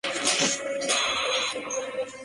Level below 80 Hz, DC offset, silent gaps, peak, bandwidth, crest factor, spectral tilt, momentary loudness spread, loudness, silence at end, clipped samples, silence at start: -64 dBFS; under 0.1%; none; -8 dBFS; 11.5 kHz; 18 dB; -0.5 dB/octave; 8 LU; -25 LUFS; 0 s; under 0.1%; 0.05 s